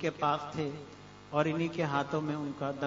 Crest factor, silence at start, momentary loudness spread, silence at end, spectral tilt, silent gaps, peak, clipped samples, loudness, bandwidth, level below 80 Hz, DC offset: 20 dB; 0 s; 12 LU; 0 s; -5 dB/octave; none; -14 dBFS; under 0.1%; -33 LUFS; 7.4 kHz; -68 dBFS; under 0.1%